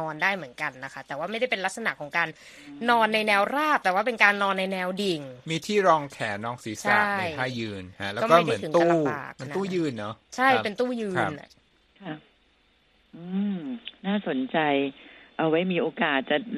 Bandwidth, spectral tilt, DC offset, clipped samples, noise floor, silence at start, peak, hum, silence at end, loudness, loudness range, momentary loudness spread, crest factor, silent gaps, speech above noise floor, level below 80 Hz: 14 kHz; -5 dB/octave; under 0.1%; under 0.1%; -64 dBFS; 0 s; -4 dBFS; none; 0 s; -25 LUFS; 7 LU; 14 LU; 22 dB; none; 38 dB; -68 dBFS